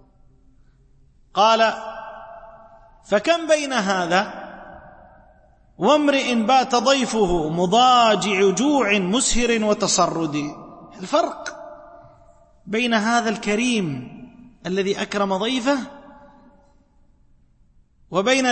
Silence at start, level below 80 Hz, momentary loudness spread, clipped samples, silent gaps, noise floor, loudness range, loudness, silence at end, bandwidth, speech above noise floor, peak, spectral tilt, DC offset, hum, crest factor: 1.35 s; -44 dBFS; 20 LU; under 0.1%; none; -56 dBFS; 8 LU; -19 LUFS; 0 s; 8.8 kHz; 37 dB; -4 dBFS; -3.5 dB/octave; under 0.1%; none; 18 dB